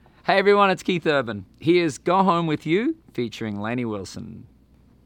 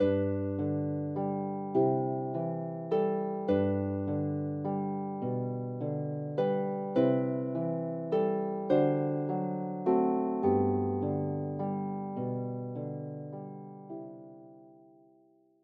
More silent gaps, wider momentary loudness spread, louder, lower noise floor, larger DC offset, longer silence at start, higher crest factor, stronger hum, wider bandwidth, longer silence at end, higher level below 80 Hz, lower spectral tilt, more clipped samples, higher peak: neither; first, 14 LU vs 11 LU; first, -22 LUFS vs -32 LUFS; second, -55 dBFS vs -65 dBFS; neither; first, 0.25 s vs 0 s; about the same, 18 dB vs 18 dB; neither; first, 11.5 kHz vs 4.9 kHz; second, 0.65 s vs 0.9 s; first, -58 dBFS vs -74 dBFS; second, -6 dB/octave vs -9 dB/octave; neither; first, -4 dBFS vs -14 dBFS